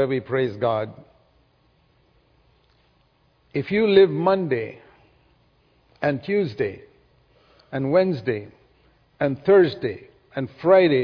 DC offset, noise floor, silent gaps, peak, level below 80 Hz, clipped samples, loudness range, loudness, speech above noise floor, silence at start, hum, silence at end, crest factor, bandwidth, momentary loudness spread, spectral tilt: under 0.1%; -62 dBFS; none; -4 dBFS; -60 dBFS; under 0.1%; 7 LU; -22 LUFS; 42 dB; 0 s; none; 0 s; 20 dB; 5.4 kHz; 15 LU; -9 dB/octave